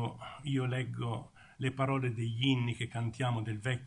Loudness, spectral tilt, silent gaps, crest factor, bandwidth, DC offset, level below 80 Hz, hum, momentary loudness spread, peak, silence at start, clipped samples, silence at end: -35 LUFS; -6.5 dB/octave; none; 18 dB; 10.5 kHz; under 0.1%; -66 dBFS; none; 9 LU; -16 dBFS; 0 s; under 0.1%; 0 s